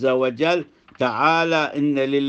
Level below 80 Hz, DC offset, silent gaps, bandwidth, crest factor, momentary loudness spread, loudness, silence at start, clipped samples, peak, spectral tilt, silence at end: -68 dBFS; under 0.1%; none; 8.2 kHz; 18 dB; 7 LU; -20 LUFS; 0 s; under 0.1%; -2 dBFS; -6 dB/octave; 0 s